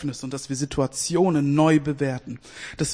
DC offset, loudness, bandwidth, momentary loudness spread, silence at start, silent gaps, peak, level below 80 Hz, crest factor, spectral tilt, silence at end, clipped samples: under 0.1%; -23 LUFS; 10.5 kHz; 16 LU; 0 s; none; -8 dBFS; -50 dBFS; 16 dB; -5.5 dB/octave; 0 s; under 0.1%